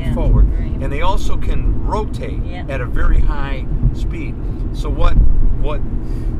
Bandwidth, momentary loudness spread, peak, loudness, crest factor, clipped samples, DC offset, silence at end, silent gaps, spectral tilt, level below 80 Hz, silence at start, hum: 7.2 kHz; 8 LU; 0 dBFS; -20 LUFS; 14 dB; under 0.1%; under 0.1%; 0 s; none; -7.5 dB/octave; -16 dBFS; 0 s; none